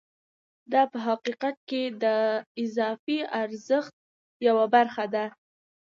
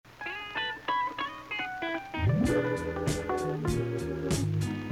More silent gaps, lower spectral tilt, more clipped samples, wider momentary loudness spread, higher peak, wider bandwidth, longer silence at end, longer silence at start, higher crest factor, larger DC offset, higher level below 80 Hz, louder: first, 1.57-1.67 s, 2.46-2.55 s, 2.99-3.07 s, 3.93-4.40 s vs none; about the same, -5 dB/octave vs -5.5 dB/octave; neither; about the same, 9 LU vs 7 LU; first, -8 dBFS vs -16 dBFS; second, 7.4 kHz vs 16 kHz; first, 0.65 s vs 0 s; first, 0.7 s vs 0.05 s; about the same, 20 dB vs 16 dB; neither; second, -82 dBFS vs -48 dBFS; first, -27 LUFS vs -31 LUFS